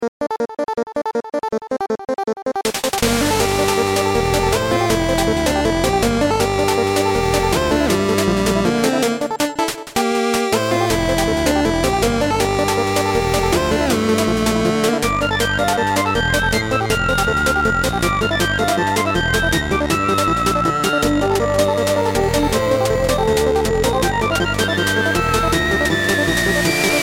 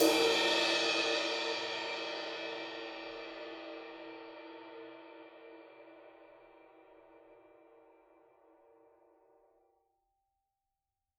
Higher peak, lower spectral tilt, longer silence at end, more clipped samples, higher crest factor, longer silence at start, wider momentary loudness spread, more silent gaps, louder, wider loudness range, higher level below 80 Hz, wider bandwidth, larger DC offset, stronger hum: first, -2 dBFS vs -14 dBFS; first, -4.5 dB/octave vs -1.5 dB/octave; second, 0 s vs 3.8 s; neither; second, 14 dB vs 24 dB; about the same, 0 s vs 0 s; second, 4 LU vs 26 LU; first, 0.08-0.20 s vs none; first, -17 LUFS vs -33 LUFS; second, 1 LU vs 26 LU; first, -32 dBFS vs -80 dBFS; about the same, 19 kHz vs 17.5 kHz; neither; neither